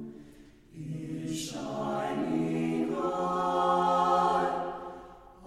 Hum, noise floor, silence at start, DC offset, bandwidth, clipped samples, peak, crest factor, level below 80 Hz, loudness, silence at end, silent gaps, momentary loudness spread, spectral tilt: none; -54 dBFS; 0 s; under 0.1%; 14.5 kHz; under 0.1%; -14 dBFS; 16 dB; -60 dBFS; -30 LUFS; 0 s; none; 16 LU; -5.5 dB/octave